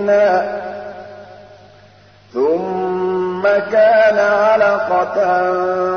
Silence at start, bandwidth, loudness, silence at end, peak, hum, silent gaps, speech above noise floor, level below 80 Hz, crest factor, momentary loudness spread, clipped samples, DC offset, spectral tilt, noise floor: 0 s; 6.6 kHz; -15 LUFS; 0 s; -4 dBFS; none; none; 32 dB; -58 dBFS; 12 dB; 16 LU; under 0.1%; 0.1%; -6 dB/octave; -46 dBFS